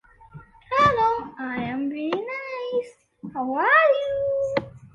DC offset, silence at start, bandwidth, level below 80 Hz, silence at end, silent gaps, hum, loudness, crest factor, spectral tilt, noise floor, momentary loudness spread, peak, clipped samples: under 0.1%; 0.35 s; 9 kHz; -54 dBFS; 0.1 s; none; none; -23 LUFS; 18 dB; -6 dB/octave; -47 dBFS; 14 LU; -6 dBFS; under 0.1%